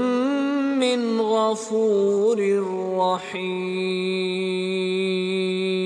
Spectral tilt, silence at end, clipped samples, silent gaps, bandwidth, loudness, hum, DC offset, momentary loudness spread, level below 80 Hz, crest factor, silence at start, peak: -5.5 dB/octave; 0 s; under 0.1%; none; 10 kHz; -23 LUFS; none; under 0.1%; 5 LU; -76 dBFS; 12 dB; 0 s; -10 dBFS